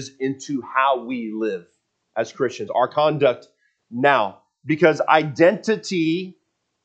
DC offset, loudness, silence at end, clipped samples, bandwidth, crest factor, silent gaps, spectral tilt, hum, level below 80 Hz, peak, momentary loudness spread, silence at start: under 0.1%; -21 LUFS; 0.55 s; under 0.1%; 8.6 kHz; 20 dB; none; -5.5 dB/octave; none; -76 dBFS; 0 dBFS; 12 LU; 0 s